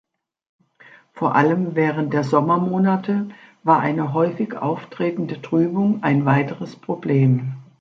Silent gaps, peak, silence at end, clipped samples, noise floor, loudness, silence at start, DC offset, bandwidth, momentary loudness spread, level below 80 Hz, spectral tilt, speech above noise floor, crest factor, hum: none; -2 dBFS; 0.2 s; under 0.1%; -50 dBFS; -20 LUFS; 1.15 s; under 0.1%; 7.4 kHz; 9 LU; -66 dBFS; -9 dB/octave; 30 dB; 18 dB; none